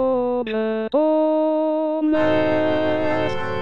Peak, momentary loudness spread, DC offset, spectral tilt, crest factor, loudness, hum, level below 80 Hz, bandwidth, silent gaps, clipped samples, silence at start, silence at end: -8 dBFS; 5 LU; under 0.1%; -7.5 dB/octave; 12 dB; -20 LUFS; none; -52 dBFS; 6.8 kHz; none; under 0.1%; 0 s; 0 s